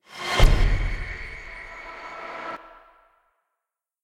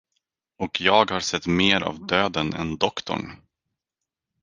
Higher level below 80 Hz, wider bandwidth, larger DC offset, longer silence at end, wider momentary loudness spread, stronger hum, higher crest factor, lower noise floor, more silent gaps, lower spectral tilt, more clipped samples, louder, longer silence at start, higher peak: first, -26 dBFS vs -52 dBFS; first, 14 kHz vs 10 kHz; neither; first, 1.45 s vs 1.05 s; first, 17 LU vs 12 LU; neither; about the same, 22 dB vs 24 dB; about the same, -85 dBFS vs -86 dBFS; neither; about the same, -4.5 dB/octave vs -4 dB/octave; neither; second, -28 LUFS vs -22 LUFS; second, 0.15 s vs 0.6 s; about the same, -4 dBFS vs -2 dBFS